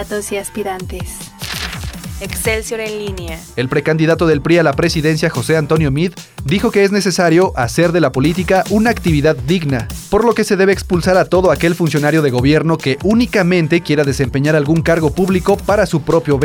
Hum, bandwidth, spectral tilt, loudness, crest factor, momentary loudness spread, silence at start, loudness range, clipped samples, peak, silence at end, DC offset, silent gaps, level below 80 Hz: none; 19 kHz; -6 dB/octave; -14 LUFS; 12 dB; 10 LU; 0 s; 5 LU; under 0.1%; -2 dBFS; 0 s; under 0.1%; none; -32 dBFS